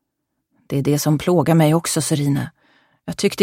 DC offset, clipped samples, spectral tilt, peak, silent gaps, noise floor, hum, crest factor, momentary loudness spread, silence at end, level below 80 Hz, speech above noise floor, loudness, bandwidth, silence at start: under 0.1%; under 0.1%; -5.5 dB/octave; -2 dBFS; none; -76 dBFS; none; 18 dB; 14 LU; 0 s; -52 dBFS; 59 dB; -18 LUFS; 16.5 kHz; 0.7 s